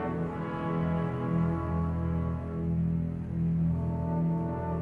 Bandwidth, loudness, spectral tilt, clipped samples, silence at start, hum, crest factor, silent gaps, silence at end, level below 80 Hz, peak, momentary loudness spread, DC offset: 3.5 kHz; -31 LUFS; -10.5 dB/octave; under 0.1%; 0 s; none; 12 dB; none; 0 s; -44 dBFS; -18 dBFS; 4 LU; under 0.1%